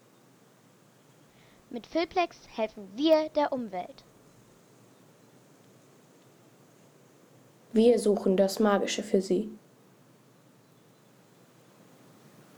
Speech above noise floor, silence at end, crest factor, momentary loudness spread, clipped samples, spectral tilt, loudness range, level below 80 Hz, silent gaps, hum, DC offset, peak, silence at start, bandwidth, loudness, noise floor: 33 dB; 3 s; 20 dB; 15 LU; under 0.1%; -5 dB/octave; 10 LU; -68 dBFS; none; none; under 0.1%; -10 dBFS; 1.7 s; 20 kHz; -28 LUFS; -60 dBFS